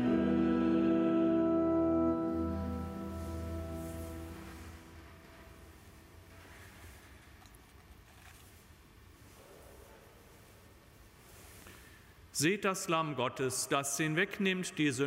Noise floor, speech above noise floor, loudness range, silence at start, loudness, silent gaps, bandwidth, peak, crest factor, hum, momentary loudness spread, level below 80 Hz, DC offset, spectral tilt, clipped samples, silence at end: -58 dBFS; 25 dB; 24 LU; 0 s; -33 LUFS; none; 16 kHz; -16 dBFS; 20 dB; none; 25 LU; -54 dBFS; under 0.1%; -4.5 dB/octave; under 0.1%; 0 s